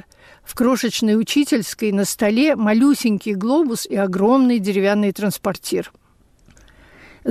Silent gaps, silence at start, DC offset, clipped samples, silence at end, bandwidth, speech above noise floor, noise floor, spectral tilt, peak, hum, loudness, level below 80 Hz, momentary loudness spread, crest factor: none; 0.5 s; under 0.1%; under 0.1%; 0 s; 15.5 kHz; 35 dB; -53 dBFS; -5 dB/octave; -8 dBFS; none; -18 LUFS; -56 dBFS; 9 LU; 12 dB